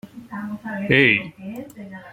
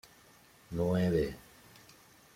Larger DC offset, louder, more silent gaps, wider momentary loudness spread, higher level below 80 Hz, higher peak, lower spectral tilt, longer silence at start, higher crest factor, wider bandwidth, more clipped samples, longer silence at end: neither; first, -18 LUFS vs -32 LUFS; neither; second, 21 LU vs 26 LU; about the same, -54 dBFS vs -56 dBFS; first, -2 dBFS vs -18 dBFS; about the same, -6.5 dB/octave vs -7.5 dB/octave; second, 0.05 s vs 0.7 s; about the same, 22 dB vs 18 dB; about the same, 16.5 kHz vs 16 kHz; neither; second, 0 s vs 0.95 s